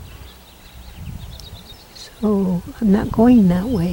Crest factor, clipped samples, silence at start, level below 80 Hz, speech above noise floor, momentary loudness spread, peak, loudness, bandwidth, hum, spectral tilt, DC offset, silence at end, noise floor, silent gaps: 16 dB; under 0.1%; 0 s; -38 dBFS; 26 dB; 25 LU; -2 dBFS; -16 LUFS; 17.5 kHz; none; -8 dB/octave; under 0.1%; 0 s; -42 dBFS; none